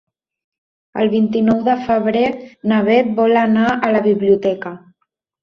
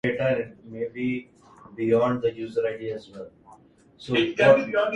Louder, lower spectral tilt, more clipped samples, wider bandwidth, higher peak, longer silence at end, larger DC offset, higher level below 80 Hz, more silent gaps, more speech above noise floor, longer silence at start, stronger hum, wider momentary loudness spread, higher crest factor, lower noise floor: first, -16 LUFS vs -24 LUFS; first, -8 dB/octave vs -6.5 dB/octave; neither; second, 6.4 kHz vs 9.2 kHz; first, 0 dBFS vs -4 dBFS; first, 0.65 s vs 0 s; neither; first, -54 dBFS vs -62 dBFS; neither; first, 56 dB vs 30 dB; first, 0.95 s vs 0.05 s; neither; second, 7 LU vs 24 LU; second, 16 dB vs 22 dB; first, -71 dBFS vs -54 dBFS